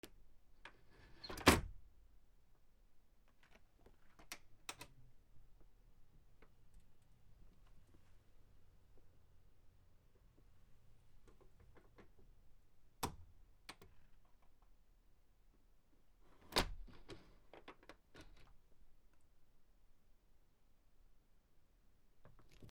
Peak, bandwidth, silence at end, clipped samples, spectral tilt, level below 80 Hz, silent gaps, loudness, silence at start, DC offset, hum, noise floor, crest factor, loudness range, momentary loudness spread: -12 dBFS; 17.5 kHz; 0 s; under 0.1%; -3.5 dB/octave; -62 dBFS; none; -39 LUFS; 0.05 s; under 0.1%; none; -69 dBFS; 38 dB; 23 LU; 29 LU